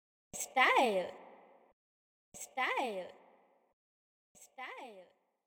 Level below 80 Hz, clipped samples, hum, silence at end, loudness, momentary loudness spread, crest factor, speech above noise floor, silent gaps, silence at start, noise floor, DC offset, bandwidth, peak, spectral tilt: -82 dBFS; under 0.1%; none; 0.45 s; -33 LUFS; 24 LU; 24 dB; 34 dB; 1.73-2.32 s, 3.73-4.35 s; 0.35 s; -68 dBFS; under 0.1%; over 20 kHz; -14 dBFS; -1.5 dB/octave